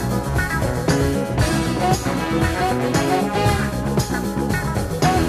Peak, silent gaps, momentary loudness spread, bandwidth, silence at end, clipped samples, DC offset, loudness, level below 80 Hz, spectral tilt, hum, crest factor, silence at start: -4 dBFS; none; 3 LU; 15.5 kHz; 0 s; under 0.1%; under 0.1%; -20 LUFS; -30 dBFS; -5.5 dB/octave; none; 16 dB; 0 s